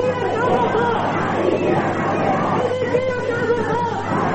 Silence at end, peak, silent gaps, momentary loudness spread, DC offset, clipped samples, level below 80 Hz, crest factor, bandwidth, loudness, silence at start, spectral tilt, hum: 0 s; -6 dBFS; none; 3 LU; under 0.1%; under 0.1%; -50 dBFS; 12 dB; 8.6 kHz; -19 LUFS; 0 s; -6.5 dB/octave; none